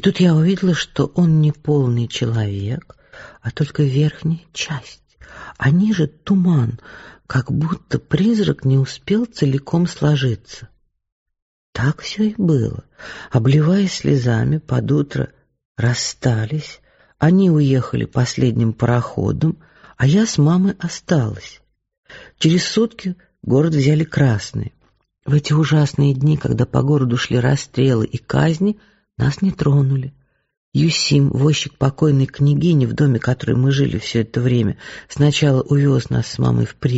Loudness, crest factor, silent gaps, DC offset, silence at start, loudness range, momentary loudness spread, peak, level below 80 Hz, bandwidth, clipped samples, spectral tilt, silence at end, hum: -18 LUFS; 16 dB; 11.12-11.26 s, 11.42-11.73 s, 15.65-15.75 s, 21.98-22.03 s, 30.57-30.72 s; under 0.1%; 0.05 s; 4 LU; 11 LU; -2 dBFS; -44 dBFS; 8 kHz; under 0.1%; -6.5 dB/octave; 0 s; none